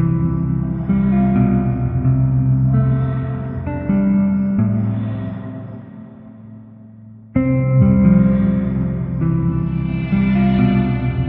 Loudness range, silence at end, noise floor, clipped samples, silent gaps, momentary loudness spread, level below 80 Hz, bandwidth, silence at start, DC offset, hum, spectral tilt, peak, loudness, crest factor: 5 LU; 0 s; -39 dBFS; under 0.1%; none; 11 LU; -32 dBFS; 4 kHz; 0 s; under 0.1%; none; -13 dB/octave; -2 dBFS; -17 LUFS; 14 dB